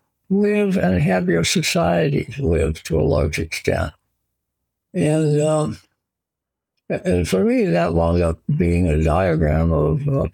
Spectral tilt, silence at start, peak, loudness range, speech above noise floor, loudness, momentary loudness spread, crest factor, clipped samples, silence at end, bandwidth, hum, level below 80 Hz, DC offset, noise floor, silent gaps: -6 dB/octave; 0.3 s; -4 dBFS; 5 LU; 66 dB; -19 LUFS; 5 LU; 16 dB; under 0.1%; 0.05 s; 18.5 kHz; none; -36 dBFS; under 0.1%; -84 dBFS; none